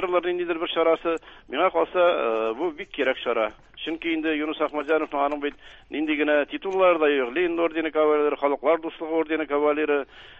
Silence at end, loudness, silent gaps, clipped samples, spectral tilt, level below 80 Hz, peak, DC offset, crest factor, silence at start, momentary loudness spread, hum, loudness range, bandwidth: 0 s; -24 LUFS; none; under 0.1%; -5.5 dB/octave; -60 dBFS; -8 dBFS; under 0.1%; 16 dB; 0 s; 9 LU; none; 4 LU; 7 kHz